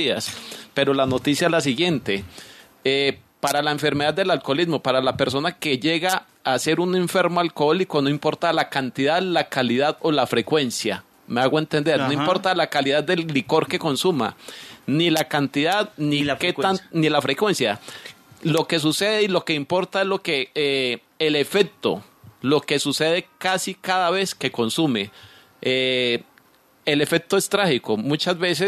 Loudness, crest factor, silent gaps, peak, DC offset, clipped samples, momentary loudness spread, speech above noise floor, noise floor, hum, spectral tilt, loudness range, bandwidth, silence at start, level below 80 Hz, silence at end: -21 LUFS; 18 dB; none; -4 dBFS; under 0.1%; under 0.1%; 7 LU; 35 dB; -56 dBFS; none; -4.5 dB/octave; 1 LU; 14 kHz; 0 s; -64 dBFS; 0 s